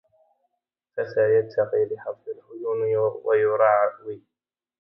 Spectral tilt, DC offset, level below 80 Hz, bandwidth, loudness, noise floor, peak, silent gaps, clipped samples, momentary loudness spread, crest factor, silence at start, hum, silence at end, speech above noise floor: -9 dB/octave; under 0.1%; -74 dBFS; 5.8 kHz; -23 LUFS; -81 dBFS; -6 dBFS; none; under 0.1%; 18 LU; 18 dB; 0.95 s; none; 0.65 s; 58 dB